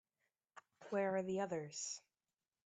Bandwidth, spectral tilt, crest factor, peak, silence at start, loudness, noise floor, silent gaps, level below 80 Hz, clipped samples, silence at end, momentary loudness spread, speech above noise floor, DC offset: 9 kHz; -4 dB/octave; 18 dB; -26 dBFS; 0.55 s; -42 LUFS; under -90 dBFS; none; -88 dBFS; under 0.1%; 0.65 s; 10 LU; over 49 dB; under 0.1%